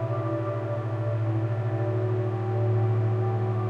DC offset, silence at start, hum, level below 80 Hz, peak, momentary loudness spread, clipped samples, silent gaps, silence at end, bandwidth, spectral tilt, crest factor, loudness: under 0.1%; 0 s; none; -58 dBFS; -16 dBFS; 4 LU; under 0.1%; none; 0 s; 4.2 kHz; -10 dB/octave; 10 dB; -27 LUFS